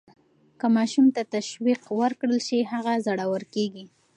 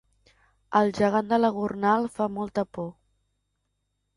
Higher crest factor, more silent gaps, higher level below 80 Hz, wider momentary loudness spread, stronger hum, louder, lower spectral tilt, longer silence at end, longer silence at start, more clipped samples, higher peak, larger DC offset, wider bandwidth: second, 14 dB vs 20 dB; neither; second, -80 dBFS vs -62 dBFS; about the same, 8 LU vs 9 LU; second, none vs 50 Hz at -65 dBFS; about the same, -25 LUFS vs -25 LUFS; second, -5 dB/octave vs -6.5 dB/octave; second, 0.3 s vs 1.25 s; about the same, 0.65 s vs 0.7 s; neither; about the same, -10 dBFS vs -8 dBFS; neither; second, 10 kHz vs 11.5 kHz